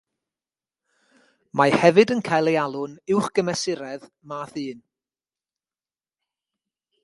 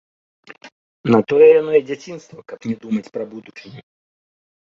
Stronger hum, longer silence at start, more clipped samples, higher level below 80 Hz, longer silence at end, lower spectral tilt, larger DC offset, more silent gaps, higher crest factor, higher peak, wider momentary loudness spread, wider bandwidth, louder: neither; first, 1.55 s vs 0.65 s; neither; about the same, -66 dBFS vs -64 dBFS; first, 2.25 s vs 0.9 s; second, -5 dB/octave vs -7.5 dB/octave; neither; second, none vs 0.72-1.04 s; first, 24 dB vs 18 dB; about the same, 0 dBFS vs -2 dBFS; second, 19 LU vs 25 LU; first, 11.5 kHz vs 7 kHz; second, -21 LUFS vs -16 LUFS